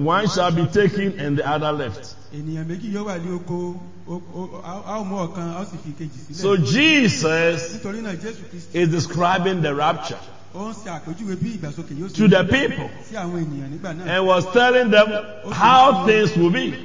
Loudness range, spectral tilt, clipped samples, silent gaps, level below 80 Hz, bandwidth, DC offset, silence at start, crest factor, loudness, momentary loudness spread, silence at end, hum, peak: 12 LU; -5.5 dB/octave; under 0.1%; none; -50 dBFS; 7.6 kHz; 1%; 0 s; 18 dB; -19 LUFS; 19 LU; 0 s; none; -2 dBFS